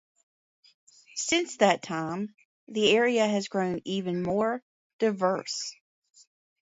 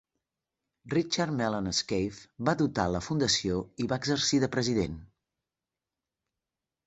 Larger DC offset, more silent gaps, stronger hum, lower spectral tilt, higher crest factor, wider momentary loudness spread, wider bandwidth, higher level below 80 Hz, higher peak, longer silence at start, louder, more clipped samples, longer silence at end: neither; first, 2.45-2.67 s, 4.62-4.99 s vs none; neither; about the same, -4 dB/octave vs -4.5 dB/octave; about the same, 22 dB vs 22 dB; first, 13 LU vs 7 LU; about the same, 8 kHz vs 8.2 kHz; second, -68 dBFS vs -54 dBFS; first, -6 dBFS vs -10 dBFS; first, 1.15 s vs 0.85 s; about the same, -27 LUFS vs -29 LUFS; neither; second, 0.9 s vs 1.8 s